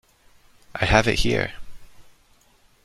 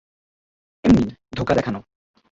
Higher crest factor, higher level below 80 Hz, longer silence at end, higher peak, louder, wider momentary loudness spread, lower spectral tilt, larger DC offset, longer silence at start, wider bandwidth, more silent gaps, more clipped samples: first, 24 dB vs 18 dB; first, -36 dBFS vs -42 dBFS; first, 0.85 s vs 0.55 s; first, -2 dBFS vs -6 dBFS; about the same, -21 LUFS vs -20 LUFS; about the same, 13 LU vs 12 LU; second, -4.5 dB/octave vs -7.5 dB/octave; neither; about the same, 0.75 s vs 0.85 s; first, 13.5 kHz vs 7.6 kHz; neither; neither